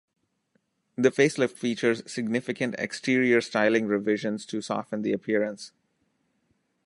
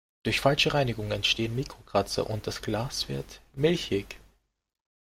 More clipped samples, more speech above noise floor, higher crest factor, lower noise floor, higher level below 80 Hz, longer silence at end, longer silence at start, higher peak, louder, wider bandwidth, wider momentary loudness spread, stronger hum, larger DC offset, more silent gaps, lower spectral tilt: neither; first, 47 dB vs 36 dB; about the same, 22 dB vs 22 dB; first, -73 dBFS vs -64 dBFS; second, -74 dBFS vs -50 dBFS; first, 1.2 s vs 1.05 s; first, 1 s vs 0.25 s; about the same, -6 dBFS vs -8 dBFS; about the same, -26 LUFS vs -28 LUFS; second, 11.5 kHz vs 16.5 kHz; about the same, 9 LU vs 11 LU; neither; neither; neither; about the same, -5 dB/octave vs -4.5 dB/octave